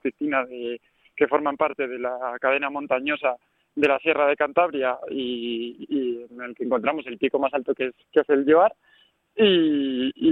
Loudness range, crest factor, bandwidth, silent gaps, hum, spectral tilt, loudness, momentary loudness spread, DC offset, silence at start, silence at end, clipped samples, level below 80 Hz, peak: 4 LU; 18 dB; 4.4 kHz; none; none; -7 dB/octave; -23 LUFS; 13 LU; under 0.1%; 0.05 s; 0 s; under 0.1%; -66 dBFS; -4 dBFS